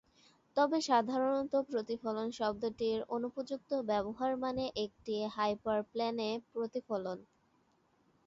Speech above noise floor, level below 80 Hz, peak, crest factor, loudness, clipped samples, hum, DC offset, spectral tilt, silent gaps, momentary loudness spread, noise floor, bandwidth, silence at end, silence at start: 38 dB; -70 dBFS; -18 dBFS; 18 dB; -36 LUFS; under 0.1%; none; under 0.1%; -3.5 dB/octave; none; 8 LU; -73 dBFS; 7.6 kHz; 1.05 s; 0.55 s